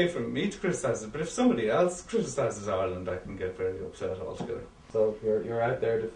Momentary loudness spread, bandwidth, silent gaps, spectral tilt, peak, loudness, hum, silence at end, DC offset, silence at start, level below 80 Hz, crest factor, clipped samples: 10 LU; 10.5 kHz; none; -5.5 dB/octave; -12 dBFS; -30 LUFS; none; 0 s; under 0.1%; 0 s; -56 dBFS; 18 dB; under 0.1%